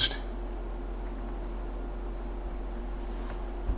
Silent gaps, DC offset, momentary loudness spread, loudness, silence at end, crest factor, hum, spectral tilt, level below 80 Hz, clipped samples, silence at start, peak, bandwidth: none; under 0.1%; 1 LU; -38 LUFS; 0 s; 20 dB; none; -3.5 dB/octave; -36 dBFS; under 0.1%; 0 s; -14 dBFS; 4 kHz